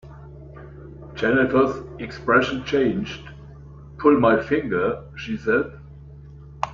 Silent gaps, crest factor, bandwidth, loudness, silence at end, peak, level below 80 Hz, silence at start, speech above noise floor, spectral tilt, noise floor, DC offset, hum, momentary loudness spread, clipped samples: none; 20 dB; 7.2 kHz; -21 LUFS; 0 s; -2 dBFS; -46 dBFS; 0.05 s; 21 dB; -7 dB/octave; -42 dBFS; under 0.1%; none; 24 LU; under 0.1%